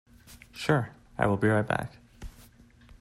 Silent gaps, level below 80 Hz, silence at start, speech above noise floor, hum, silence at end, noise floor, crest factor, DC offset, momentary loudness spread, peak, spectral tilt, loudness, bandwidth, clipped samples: none; -52 dBFS; 0.3 s; 29 dB; none; 0.6 s; -55 dBFS; 20 dB; under 0.1%; 23 LU; -10 dBFS; -7 dB/octave; -28 LUFS; 15 kHz; under 0.1%